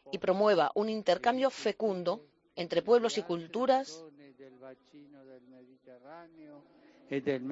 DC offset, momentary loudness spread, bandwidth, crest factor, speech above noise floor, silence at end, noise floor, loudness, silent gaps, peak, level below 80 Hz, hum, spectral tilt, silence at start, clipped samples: under 0.1%; 24 LU; 8 kHz; 20 dB; 27 dB; 0 s; -58 dBFS; -30 LUFS; none; -12 dBFS; -76 dBFS; none; -5 dB/octave; 0.05 s; under 0.1%